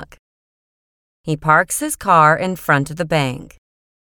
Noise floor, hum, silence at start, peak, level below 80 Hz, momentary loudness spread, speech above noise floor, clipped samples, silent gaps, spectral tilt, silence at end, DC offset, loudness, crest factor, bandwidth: under -90 dBFS; none; 0 s; 0 dBFS; -48 dBFS; 13 LU; over 74 dB; under 0.1%; 0.19-1.24 s; -4.5 dB/octave; 0.6 s; under 0.1%; -16 LUFS; 18 dB; 19 kHz